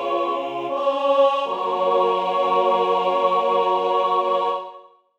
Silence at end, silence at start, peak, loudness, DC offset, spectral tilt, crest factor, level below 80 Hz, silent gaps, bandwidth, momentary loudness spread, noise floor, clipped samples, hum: 0.35 s; 0 s; -6 dBFS; -20 LUFS; under 0.1%; -5 dB/octave; 14 dB; -76 dBFS; none; 8.2 kHz; 6 LU; -44 dBFS; under 0.1%; none